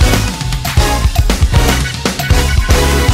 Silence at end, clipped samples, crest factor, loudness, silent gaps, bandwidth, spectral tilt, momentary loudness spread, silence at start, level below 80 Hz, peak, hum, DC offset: 0 s; under 0.1%; 12 dB; -13 LUFS; none; 16.5 kHz; -4.5 dB/octave; 5 LU; 0 s; -14 dBFS; 0 dBFS; none; under 0.1%